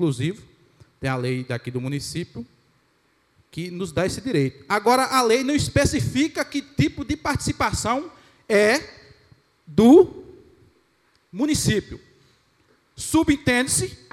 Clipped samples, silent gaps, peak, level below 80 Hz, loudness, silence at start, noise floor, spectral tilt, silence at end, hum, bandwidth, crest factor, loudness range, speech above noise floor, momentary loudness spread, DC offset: under 0.1%; none; -2 dBFS; -46 dBFS; -21 LUFS; 0 s; -64 dBFS; -5 dB/octave; 0.2 s; none; 16 kHz; 20 dB; 9 LU; 43 dB; 16 LU; under 0.1%